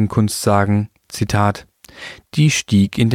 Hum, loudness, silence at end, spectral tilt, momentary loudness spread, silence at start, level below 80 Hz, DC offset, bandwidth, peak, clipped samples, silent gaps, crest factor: none; -17 LUFS; 0 s; -5.5 dB/octave; 17 LU; 0 s; -44 dBFS; under 0.1%; 16 kHz; -2 dBFS; under 0.1%; none; 16 dB